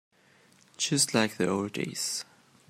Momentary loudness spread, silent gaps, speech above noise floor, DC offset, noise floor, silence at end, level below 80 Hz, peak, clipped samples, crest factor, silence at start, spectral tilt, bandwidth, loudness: 10 LU; none; 33 dB; under 0.1%; -62 dBFS; 0.45 s; -74 dBFS; -8 dBFS; under 0.1%; 22 dB; 0.8 s; -3 dB/octave; 16 kHz; -28 LUFS